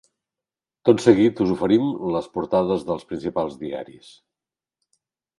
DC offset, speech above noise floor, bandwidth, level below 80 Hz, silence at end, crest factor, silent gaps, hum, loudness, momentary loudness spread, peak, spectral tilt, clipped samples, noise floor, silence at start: under 0.1%; 69 dB; 11.5 kHz; -56 dBFS; 1.55 s; 22 dB; none; none; -21 LUFS; 14 LU; 0 dBFS; -7 dB/octave; under 0.1%; -90 dBFS; 0.85 s